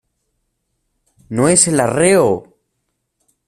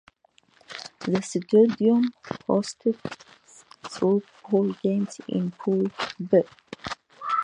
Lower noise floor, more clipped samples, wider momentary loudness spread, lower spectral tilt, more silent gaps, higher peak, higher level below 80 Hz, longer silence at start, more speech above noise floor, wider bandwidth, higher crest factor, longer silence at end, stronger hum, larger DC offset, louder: first, -72 dBFS vs -62 dBFS; neither; second, 11 LU vs 18 LU; second, -4 dB/octave vs -6.5 dB/octave; neither; first, 0 dBFS vs -6 dBFS; first, -52 dBFS vs -66 dBFS; first, 1.3 s vs 0.7 s; first, 58 dB vs 38 dB; first, 15.5 kHz vs 10.5 kHz; about the same, 18 dB vs 18 dB; first, 1.05 s vs 0 s; neither; neither; first, -13 LUFS vs -25 LUFS